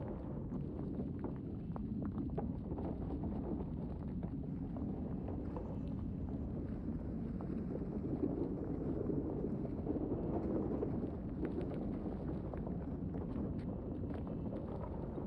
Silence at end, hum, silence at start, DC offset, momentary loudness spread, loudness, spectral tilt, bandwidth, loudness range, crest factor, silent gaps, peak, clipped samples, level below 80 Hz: 0 s; none; 0 s; under 0.1%; 4 LU; -42 LUFS; -11.5 dB/octave; 5.2 kHz; 3 LU; 16 dB; none; -24 dBFS; under 0.1%; -50 dBFS